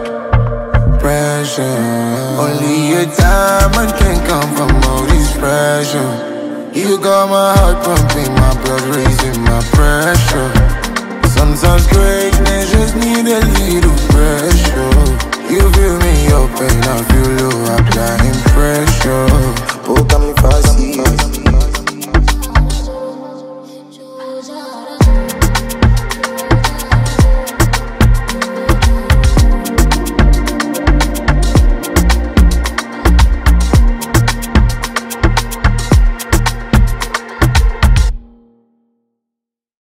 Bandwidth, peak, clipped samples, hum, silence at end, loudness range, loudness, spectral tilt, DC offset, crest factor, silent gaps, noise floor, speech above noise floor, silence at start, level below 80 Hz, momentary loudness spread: 16.5 kHz; 0 dBFS; under 0.1%; none; 1.75 s; 4 LU; -12 LUFS; -5 dB/octave; under 0.1%; 10 dB; none; -82 dBFS; 72 dB; 0 s; -14 dBFS; 7 LU